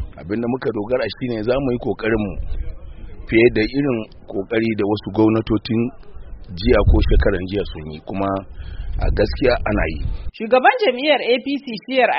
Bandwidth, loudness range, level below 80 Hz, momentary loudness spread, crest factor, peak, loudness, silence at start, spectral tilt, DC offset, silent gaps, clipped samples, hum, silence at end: 5.8 kHz; 3 LU; -26 dBFS; 15 LU; 18 dB; 0 dBFS; -19 LUFS; 0 s; -5 dB/octave; under 0.1%; none; under 0.1%; none; 0 s